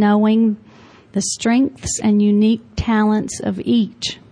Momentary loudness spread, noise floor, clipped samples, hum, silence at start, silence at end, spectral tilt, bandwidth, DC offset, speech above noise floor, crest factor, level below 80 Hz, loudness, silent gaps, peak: 9 LU; -45 dBFS; under 0.1%; none; 0 s; 0.15 s; -5 dB/octave; 10.5 kHz; under 0.1%; 28 dB; 10 dB; -42 dBFS; -17 LUFS; none; -6 dBFS